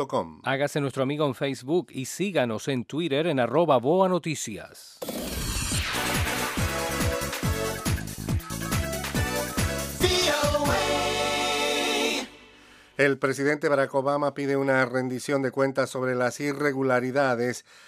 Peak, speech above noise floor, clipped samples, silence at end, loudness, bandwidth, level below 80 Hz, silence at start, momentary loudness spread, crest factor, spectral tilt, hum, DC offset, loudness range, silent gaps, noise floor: -8 dBFS; 27 dB; under 0.1%; 0.25 s; -26 LUFS; 16 kHz; -42 dBFS; 0 s; 8 LU; 18 dB; -4 dB/octave; none; under 0.1%; 3 LU; none; -53 dBFS